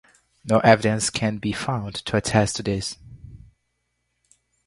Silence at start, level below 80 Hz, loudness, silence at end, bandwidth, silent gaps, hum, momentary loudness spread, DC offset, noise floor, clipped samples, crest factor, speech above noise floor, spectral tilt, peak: 0.45 s; -48 dBFS; -22 LUFS; 1.3 s; 11.5 kHz; none; none; 12 LU; under 0.1%; -74 dBFS; under 0.1%; 24 dB; 53 dB; -4.5 dB/octave; 0 dBFS